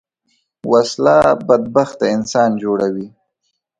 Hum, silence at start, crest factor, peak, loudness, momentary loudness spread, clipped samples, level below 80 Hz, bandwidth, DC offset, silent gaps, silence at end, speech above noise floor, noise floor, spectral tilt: none; 0.65 s; 16 dB; 0 dBFS; -15 LUFS; 11 LU; under 0.1%; -54 dBFS; 10.5 kHz; under 0.1%; none; 0.7 s; 57 dB; -71 dBFS; -5.5 dB/octave